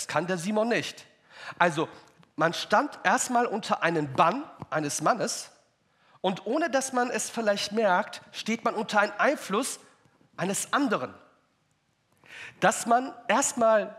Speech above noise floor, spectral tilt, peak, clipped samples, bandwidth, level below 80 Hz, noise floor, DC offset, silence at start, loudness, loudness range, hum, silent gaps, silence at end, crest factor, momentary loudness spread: 44 dB; -3.5 dB/octave; -6 dBFS; under 0.1%; 15.5 kHz; -78 dBFS; -71 dBFS; under 0.1%; 0 s; -27 LUFS; 3 LU; none; none; 0 s; 22 dB; 12 LU